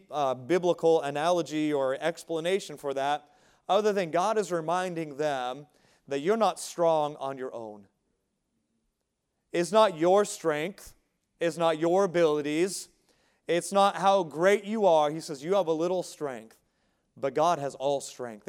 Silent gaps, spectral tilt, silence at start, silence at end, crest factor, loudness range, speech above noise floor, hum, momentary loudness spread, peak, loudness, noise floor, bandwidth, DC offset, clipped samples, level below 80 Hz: none; -4.5 dB/octave; 0.1 s; 0.1 s; 20 dB; 5 LU; 53 dB; none; 12 LU; -8 dBFS; -27 LUFS; -80 dBFS; 16.5 kHz; under 0.1%; under 0.1%; -74 dBFS